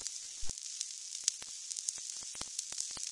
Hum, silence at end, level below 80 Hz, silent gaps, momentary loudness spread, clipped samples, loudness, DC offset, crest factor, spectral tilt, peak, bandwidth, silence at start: none; 0 s; -60 dBFS; none; 6 LU; under 0.1%; -39 LUFS; under 0.1%; 34 dB; 1.5 dB/octave; -6 dBFS; 11.5 kHz; 0 s